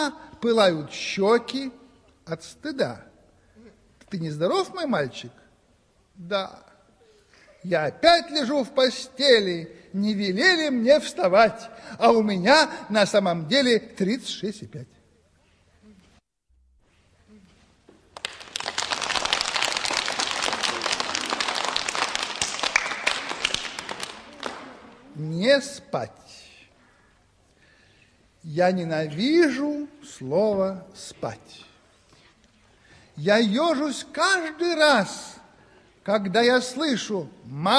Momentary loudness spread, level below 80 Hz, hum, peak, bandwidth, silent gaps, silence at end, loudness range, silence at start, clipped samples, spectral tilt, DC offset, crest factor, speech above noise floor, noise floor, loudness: 17 LU; -62 dBFS; none; -2 dBFS; 11 kHz; none; 0 s; 10 LU; 0 s; under 0.1%; -3.5 dB/octave; under 0.1%; 22 dB; 41 dB; -64 dBFS; -23 LUFS